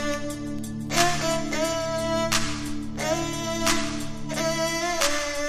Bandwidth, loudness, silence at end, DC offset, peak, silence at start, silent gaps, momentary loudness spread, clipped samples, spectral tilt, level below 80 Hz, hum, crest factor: 15.5 kHz; -26 LUFS; 0 s; under 0.1%; -6 dBFS; 0 s; none; 9 LU; under 0.1%; -3 dB/octave; -44 dBFS; none; 20 dB